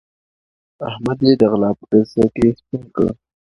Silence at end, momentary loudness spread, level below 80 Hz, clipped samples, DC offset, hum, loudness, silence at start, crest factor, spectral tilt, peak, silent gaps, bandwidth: 0.4 s; 15 LU; -46 dBFS; under 0.1%; under 0.1%; none; -17 LUFS; 0.8 s; 18 dB; -8.5 dB/octave; 0 dBFS; none; 10.5 kHz